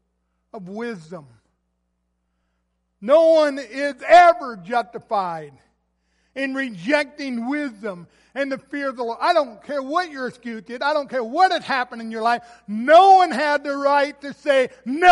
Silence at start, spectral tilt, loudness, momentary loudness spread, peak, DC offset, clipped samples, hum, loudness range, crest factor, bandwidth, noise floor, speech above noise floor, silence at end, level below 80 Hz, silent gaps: 0.55 s; -4 dB/octave; -19 LUFS; 19 LU; -2 dBFS; under 0.1%; under 0.1%; none; 8 LU; 18 dB; 11.5 kHz; -72 dBFS; 53 dB; 0 s; -66 dBFS; none